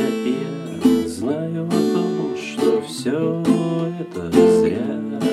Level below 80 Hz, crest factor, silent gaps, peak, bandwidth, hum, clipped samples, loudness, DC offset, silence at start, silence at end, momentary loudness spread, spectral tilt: -54 dBFS; 18 dB; none; -2 dBFS; 15 kHz; none; under 0.1%; -20 LUFS; under 0.1%; 0 s; 0 s; 10 LU; -6.5 dB/octave